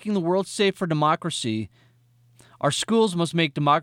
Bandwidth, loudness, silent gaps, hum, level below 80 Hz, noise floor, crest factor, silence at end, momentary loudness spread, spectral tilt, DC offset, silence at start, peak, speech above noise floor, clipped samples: 16 kHz; -23 LUFS; none; none; -66 dBFS; -59 dBFS; 16 dB; 0 s; 7 LU; -5 dB/octave; under 0.1%; 0.05 s; -8 dBFS; 36 dB; under 0.1%